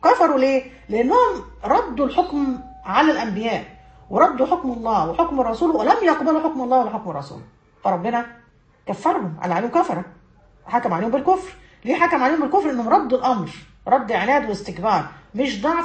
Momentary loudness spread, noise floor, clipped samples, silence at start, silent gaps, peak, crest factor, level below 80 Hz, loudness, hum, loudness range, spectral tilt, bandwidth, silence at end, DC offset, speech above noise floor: 12 LU; -52 dBFS; under 0.1%; 0 s; none; -2 dBFS; 18 dB; -50 dBFS; -20 LUFS; none; 5 LU; -6 dB/octave; 8.6 kHz; 0 s; under 0.1%; 32 dB